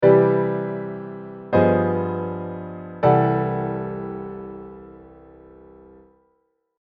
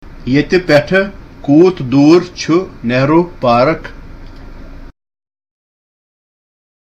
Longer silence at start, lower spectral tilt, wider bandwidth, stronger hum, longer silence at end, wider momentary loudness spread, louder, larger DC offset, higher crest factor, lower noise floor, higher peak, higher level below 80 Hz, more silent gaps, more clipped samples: about the same, 0 s vs 0.05 s; first, -11 dB/octave vs -6.5 dB/octave; second, 5 kHz vs 8.4 kHz; neither; second, 1.6 s vs 1.9 s; first, 18 LU vs 9 LU; second, -22 LUFS vs -12 LUFS; neither; first, 20 dB vs 14 dB; first, -69 dBFS vs -31 dBFS; about the same, -2 dBFS vs 0 dBFS; second, -54 dBFS vs -36 dBFS; neither; neither